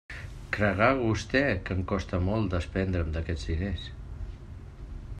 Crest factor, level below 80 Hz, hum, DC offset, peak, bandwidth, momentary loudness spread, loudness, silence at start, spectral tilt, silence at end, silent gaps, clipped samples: 22 dB; -40 dBFS; none; under 0.1%; -8 dBFS; 10 kHz; 19 LU; -29 LUFS; 0.1 s; -6.5 dB/octave; 0 s; none; under 0.1%